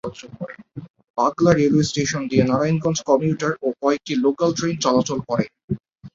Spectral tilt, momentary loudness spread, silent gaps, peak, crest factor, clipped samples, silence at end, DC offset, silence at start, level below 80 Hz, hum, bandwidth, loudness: -5.5 dB/octave; 17 LU; 0.90-0.94 s, 1.10-1.14 s, 5.64-5.68 s; -2 dBFS; 18 dB; under 0.1%; 0.05 s; under 0.1%; 0.05 s; -52 dBFS; none; 7.8 kHz; -20 LUFS